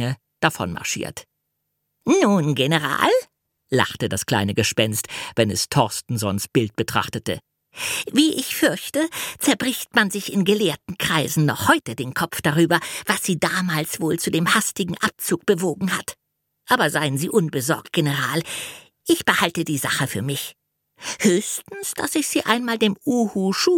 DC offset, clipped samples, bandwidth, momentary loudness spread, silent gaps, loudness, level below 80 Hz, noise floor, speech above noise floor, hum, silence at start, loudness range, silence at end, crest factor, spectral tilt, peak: under 0.1%; under 0.1%; 17.5 kHz; 8 LU; none; -21 LUFS; -58 dBFS; -76 dBFS; 55 dB; none; 0 s; 2 LU; 0 s; 22 dB; -4 dB/octave; 0 dBFS